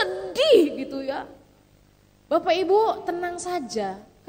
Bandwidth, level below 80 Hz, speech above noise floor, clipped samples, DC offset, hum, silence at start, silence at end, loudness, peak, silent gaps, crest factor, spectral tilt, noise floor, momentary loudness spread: 16 kHz; -60 dBFS; 34 dB; under 0.1%; under 0.1%; 50 Hz at -60 dBFS; 0 s; 0.25 s; -23 LUFS; -6 dBFS; none; 18 dB; -3.5 dB/octave; -57 dBFS; 14 LU